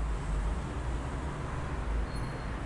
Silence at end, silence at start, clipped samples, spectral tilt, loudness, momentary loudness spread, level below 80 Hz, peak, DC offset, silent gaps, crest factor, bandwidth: 0 s; 0 s; under 0.1%; -6.5 dB/octave; -36 LUFS; 2 LU; -36 dBFS; -22 dBFS; under 0.1%; none; 12 dB; 11 kHz